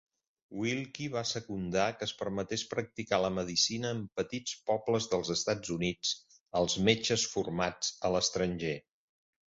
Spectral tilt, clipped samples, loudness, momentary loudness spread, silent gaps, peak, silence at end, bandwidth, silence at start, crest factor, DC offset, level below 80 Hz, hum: -3.5 dB/octave; under 0.1%; -32 LUFS; 8 LU; 6.41-6.46 s; -10 dBFS; 0.75 s; 8 kHz; 0.5 s; 24 dB; under 0.1%; -60 dBFS; none